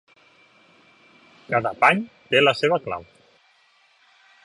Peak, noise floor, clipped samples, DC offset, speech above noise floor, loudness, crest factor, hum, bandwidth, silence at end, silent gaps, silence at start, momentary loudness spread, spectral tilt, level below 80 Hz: -2 dBFS; -60 dBFS; under 0.1%; under 0.1%; 39 dB; -21 LUFS; 22 dB; none; 11.5 kHz; 1.4 s; none; 1.5 s; 10 LU; -5 dB/octave; -64 dBFS